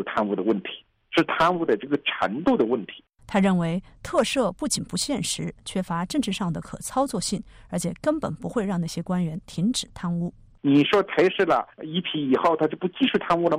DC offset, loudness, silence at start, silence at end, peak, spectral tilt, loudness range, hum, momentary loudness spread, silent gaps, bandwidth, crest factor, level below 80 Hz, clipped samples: under 0.1%; -25 LUFS; 0 s; 0 s; -10 dBFS; -5 dB/octave; 5 LU; none; 9 LU; none; 15.5 kHz; 14 dB; -52 dBFS; under 0.1%